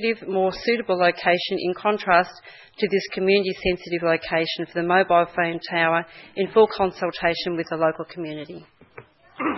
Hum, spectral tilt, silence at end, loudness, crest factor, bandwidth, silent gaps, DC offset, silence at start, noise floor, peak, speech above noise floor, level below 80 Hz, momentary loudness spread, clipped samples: none; -6.5 dB/octave; 0 s; -22 LUFS; 20 dB; 6 kHz; none; under 0.1%; 0 s; -48 dBFS; -2 dBFS; 25 dB; -54 dBFS; 11 LU; under 0.1%